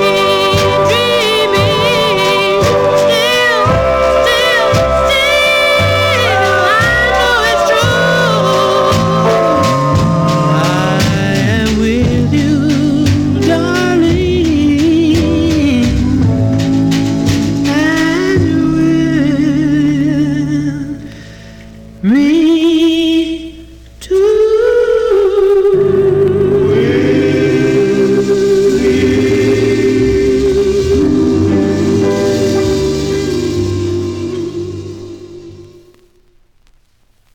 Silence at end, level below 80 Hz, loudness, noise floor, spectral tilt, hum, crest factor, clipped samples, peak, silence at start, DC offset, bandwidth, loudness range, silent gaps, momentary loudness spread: 1.7 s; -30 dBFS; -11 LUFS; -54 dBFS; -5.5 dB/octave; none; 10 dB; under 0.1%; 0 dBFS; 0 s; 0.2%; 18.5 kHz; 4 LU; none; 6 LU